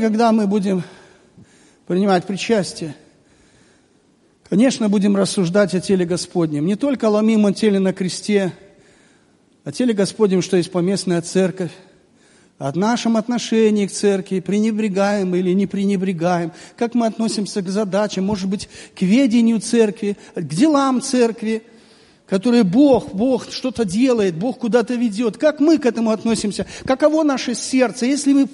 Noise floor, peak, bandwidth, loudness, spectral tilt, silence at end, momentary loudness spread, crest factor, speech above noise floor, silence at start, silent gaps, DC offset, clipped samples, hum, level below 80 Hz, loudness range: -56 dBFS; -2 dBFS; 11.5 kHz; -18 LUFS; -5.5 dB/octave; 0.05 s; 9 LU; 16 dB; 39 dB; 0 s; none; under 0.1%; under 0.1%; none; -56 dBFS; 3 LU